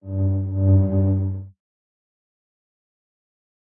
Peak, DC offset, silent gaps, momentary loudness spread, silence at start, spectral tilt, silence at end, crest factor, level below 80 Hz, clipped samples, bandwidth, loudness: -6 dBFS; under 0.1%; none; 9 LU; 0.05 s; -15.5 dB/octave; 2.2 s; 16 dB; -54 dBFS; under 0.1%; 1.6 kHz; -21 LUFS